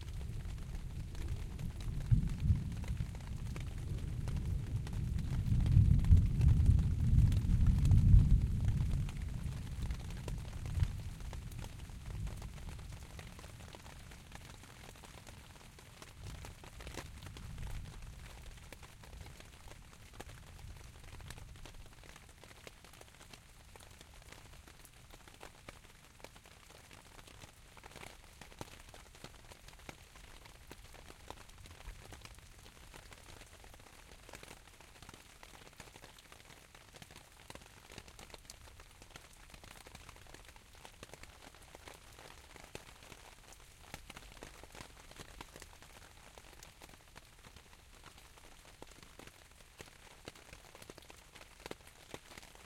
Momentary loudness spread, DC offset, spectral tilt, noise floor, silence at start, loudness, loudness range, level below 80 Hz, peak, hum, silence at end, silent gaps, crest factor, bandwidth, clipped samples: 24 LU; under 0.1%; -6.5 dB/octave; -60 dBFS; 0 s; -36 LUFS; 23 LU; -42 dBFS; -12 dBFS; none; 0 s; none; 26 dB; 16 kHz; under 0.1%